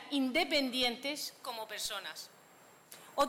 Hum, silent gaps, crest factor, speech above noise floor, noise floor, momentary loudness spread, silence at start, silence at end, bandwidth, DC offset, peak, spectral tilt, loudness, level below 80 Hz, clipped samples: none; none; 18 dB; 25 dB; -60 dBFS; 19 LU; 0 s; 0 s; 17 kHz; under 0.1%; -18 dBFS; -1.5 dB/octave; -34 LUFS; -70 dBFS; under 0.1%